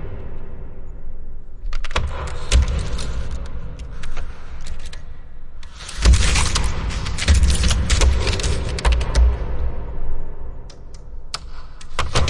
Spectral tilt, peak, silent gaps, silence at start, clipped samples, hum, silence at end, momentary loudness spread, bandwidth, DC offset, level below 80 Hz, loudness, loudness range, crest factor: -4 dB/octave; -4 dBFS; none; 0 s; under 0.1%; none; 0 s; 22 LU; 11.5 kHz; under 0.1%; -22 dBFS; -21 LUFS; 8 LU; 16 dB